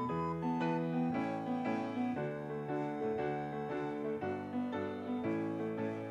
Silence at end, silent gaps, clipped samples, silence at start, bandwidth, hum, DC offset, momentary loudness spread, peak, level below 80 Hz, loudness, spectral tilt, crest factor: 0 s; none; under 0.1%; 0 s; 8.6 kHz; none; under 0.1%; 4 LU; -24 dBFS; -70 dBFS; -38 LUFS; -8.5 dB/octave; 12 dB